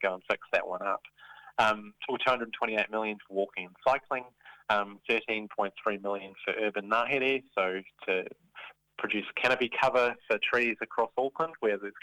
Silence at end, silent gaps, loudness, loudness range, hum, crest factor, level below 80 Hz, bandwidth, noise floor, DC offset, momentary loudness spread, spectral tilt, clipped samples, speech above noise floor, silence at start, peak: 0.05 s; none; -30 LUFS; 3 LU; none; 18 dB; -70 dBFS; 14 kHz; -51 dBFS; under 0.1%; 10 LU; -4.5 dB/octave; under 0.1%; 20 dB; 0 s; -12 dBFS